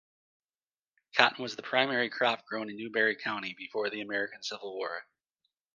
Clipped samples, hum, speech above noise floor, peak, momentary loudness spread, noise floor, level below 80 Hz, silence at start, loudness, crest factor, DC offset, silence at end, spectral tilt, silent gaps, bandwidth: under 0.1%; none; over 58 dB; -2 dBFS; 12 LU; under -90 dBFS; -82 dBFS; 1.15 s; -31 LUFS; 30 dB; under 0.1%; 0.75 s; -3 dB/octave; none; 9.6 kHz